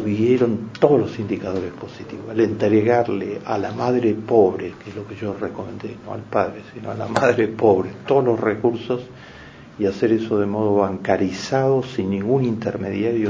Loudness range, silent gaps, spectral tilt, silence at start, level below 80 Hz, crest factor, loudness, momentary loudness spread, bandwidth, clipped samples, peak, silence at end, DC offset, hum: 2 LU; none; -7.5 dB/octave; 0 s; -52 dBFS; 20 dB; -20 LUFS; 15 LU; 8 kHz; under 0.1%; 0 dBFS; 0 s; under 0.1%; none